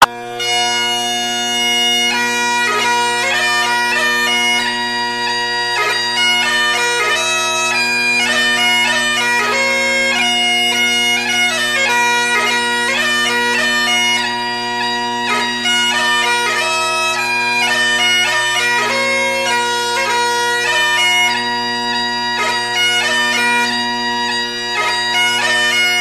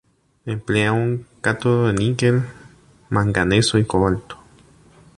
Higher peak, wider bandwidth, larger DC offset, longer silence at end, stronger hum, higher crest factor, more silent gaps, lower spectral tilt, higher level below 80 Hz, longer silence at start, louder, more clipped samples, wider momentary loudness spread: about the same, 0 dBFS vs -2 dBFS; first, 14 kHz vs 11.5 kHz; first, 0.1% vs under 0.1%; second, 0 s vs 0.85 s; neither; about the same, 16 dB vs 18 dB; neither; second, -0.5 dB/octave vs -5.5 dB/octave; second, -58 dBFS vs -42 dBFS; second, 0 s vs 0.45 s; first, -13 LUFS vs -19 LUFS; neither; second, 5 LU vs 13 LU